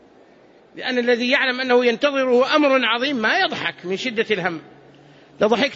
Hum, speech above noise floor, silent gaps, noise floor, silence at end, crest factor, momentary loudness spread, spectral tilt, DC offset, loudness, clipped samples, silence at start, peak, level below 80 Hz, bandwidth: none; 31 dB; none; -50 dBFS; 0 s; 16 dB; 9 LU; -4 dB/octave; under 0.1%; -19 LUFS; under 0.1%; 0.75 s; -4 dBFS; -66 dBFS; 7.8 kHz